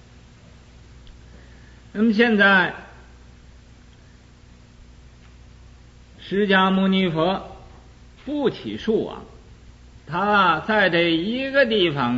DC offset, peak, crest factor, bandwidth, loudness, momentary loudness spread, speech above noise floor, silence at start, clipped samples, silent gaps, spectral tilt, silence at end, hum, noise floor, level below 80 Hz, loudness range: under 0.1%; -4 dBFS; 18 dB; 7.8 kHz; -20 LUFS; 17 LU; 29 dB; 1.1 s; under 0.1%; none; -6.5 dB/octave; 0 s; 60 Hz at -50 dBFS; -48 dBFS; -50 dBFS; 5 LU